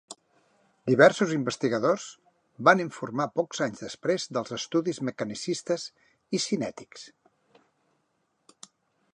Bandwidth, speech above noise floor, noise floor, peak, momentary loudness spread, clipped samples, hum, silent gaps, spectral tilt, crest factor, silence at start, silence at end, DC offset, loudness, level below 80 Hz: 11 kHz; 48 dB; -74 dBFS; -4 dBFS; 20 LU; under 0.1%; none; none; -4.5 dB/octave; 24 dB; 0.1 s; 2.05 s; under 0.1%; -27 LUFS; -74 dBFS